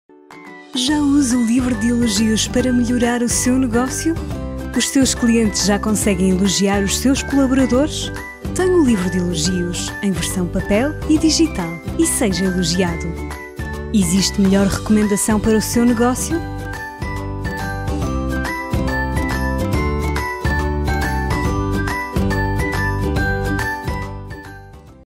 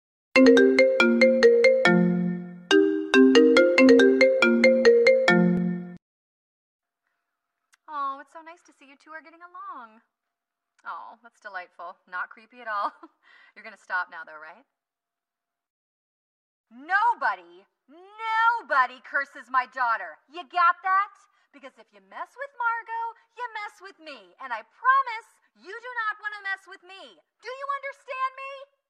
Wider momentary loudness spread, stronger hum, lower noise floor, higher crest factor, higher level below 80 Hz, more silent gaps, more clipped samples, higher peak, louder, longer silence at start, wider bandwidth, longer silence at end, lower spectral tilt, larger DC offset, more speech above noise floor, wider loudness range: second, 11 LU vs 24 LU; neither; second, -39 dBFS vs -90 dBFS; second, 14 dB vs 20 dB; first, -28 dBFS vs -70 dBFS; second, none vs 6.02-6.79 s, 15.70-16.64 s; neither; about the same, -4 dBFS vs -4 dBFS; first, -18 LUFS vs -21 LUFS; about the same, 0.3 s vs 0.35 s; first, 16.5 kHz vs 10.5 kHz; about the same, 0.15 s vs 0.25 s; about the same, -4.5 dB/octave vs -5.5 dB/octave; neither; second, 23 dB vs 62 dB; second, 4 LU vs 21 LU